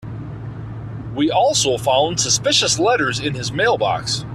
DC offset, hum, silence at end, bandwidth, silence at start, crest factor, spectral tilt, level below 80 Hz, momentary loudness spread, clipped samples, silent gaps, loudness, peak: under 0.1%; none; 0 s; 14 kHz; 0 s; 16 dB; -3 dB/octave; -44 dBFS; 16 LU; under 0.1%; none; -17 LUFS; -2 dBFS